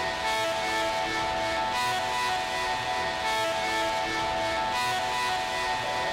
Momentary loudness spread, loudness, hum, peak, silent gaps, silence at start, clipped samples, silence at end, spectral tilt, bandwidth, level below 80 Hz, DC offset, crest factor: 1 LU; -27 LUFS; none; -18 dBFS; none; 0 s; under 0.1%; 0 s; -2 dB/octave; 16.5 kHz; -52 dBFS; under 0.1%; 10 dB